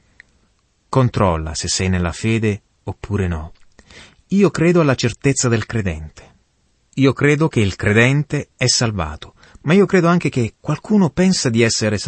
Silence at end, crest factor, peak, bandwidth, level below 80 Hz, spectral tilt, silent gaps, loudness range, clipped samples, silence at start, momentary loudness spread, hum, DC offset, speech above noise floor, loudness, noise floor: 0 s; 16 dB; -2 dBFS; 8.8 kHz; -40 dBFS; -5 dB/octave; none; 4 LU; under 0.1%; 0.9 s; 13 LU; none; under 0.1%; 45 dB; -17 LUFS; -62 dBFS